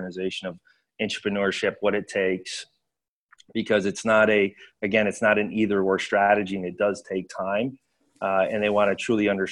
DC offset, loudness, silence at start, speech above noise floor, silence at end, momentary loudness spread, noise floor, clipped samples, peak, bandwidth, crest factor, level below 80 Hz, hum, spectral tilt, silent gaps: under 0.1%; -24 LUFS; 0 s; 61 dB; 0 s; 11 LU; -85 dBFS; under 0.1%; -6 dBFS; 11.5 kHz; 18 dB; -62 dBFS; none; -5 dB/octave; 3.08-3.29 s